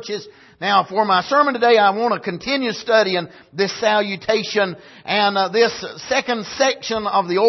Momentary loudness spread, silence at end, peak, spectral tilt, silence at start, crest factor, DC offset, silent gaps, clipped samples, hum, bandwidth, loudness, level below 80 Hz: 9 LU; 0 s; -2 dBFS; -3.5 dB/octave; 0 s; 16 dB; under 0.1%; none; under 0.1%; none; 6.2 kHz; -18 LUFS; -60 dBFS